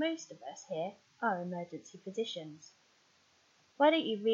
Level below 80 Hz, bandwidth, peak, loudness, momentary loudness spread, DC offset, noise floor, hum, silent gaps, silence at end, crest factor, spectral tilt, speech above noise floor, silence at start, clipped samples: under -90 dBFS; 7.6 kHz; -16 dBFS; -35 LUFS; 19 LU; under 0.1%; -69 dBFS; none; none; 0 s; 20 dB; -4.5 dB/octave; 34 dB; 0 s; under 0.1%